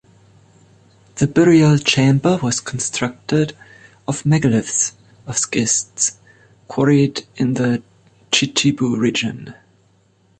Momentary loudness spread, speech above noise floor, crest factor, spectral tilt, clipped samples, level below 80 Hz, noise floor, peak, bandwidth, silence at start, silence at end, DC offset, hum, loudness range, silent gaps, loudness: 10 LU; 40 dB; 16 dB; -4.5 dB/octave; under 0.1%; -52 dBFS; -57 dBFS; -2 dBFS; 9.2 kHz; 1.15 s; 0.85 s; under 0.1%; none; 3 LU; none; -17 LUFS